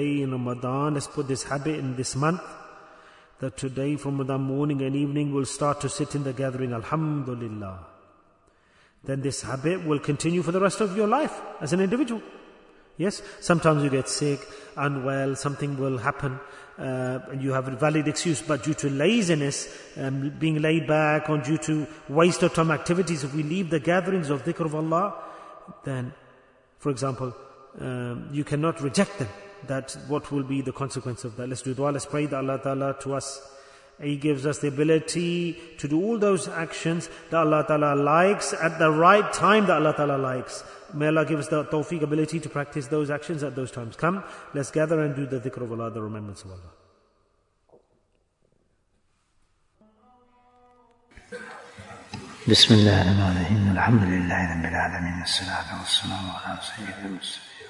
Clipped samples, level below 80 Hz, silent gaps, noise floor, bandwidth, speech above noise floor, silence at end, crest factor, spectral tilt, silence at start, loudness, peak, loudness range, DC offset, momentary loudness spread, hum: under 0.1%; -58 dBFS; none; -68 dBFS; 11 kHz; 43 dB; 0 s; 22 dB; -5 dB/octave; 0 s; -25 LUFS; -4 dBFS; 10 LU; under 0.1%; 14 LU; none